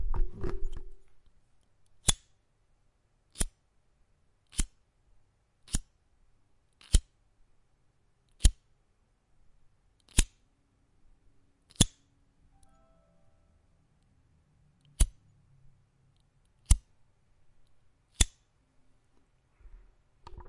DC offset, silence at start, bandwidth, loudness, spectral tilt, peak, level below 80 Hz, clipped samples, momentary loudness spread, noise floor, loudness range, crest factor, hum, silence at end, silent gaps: under 0.1%; 0 s; 11.5 kHz; -32 LUFS; -3 dB/octave; -4 dBFS; -36 dBFS; under 0.1%; 16 LU; -70 dBFS; 6 LU; 32 dB; none; 0.05 s; none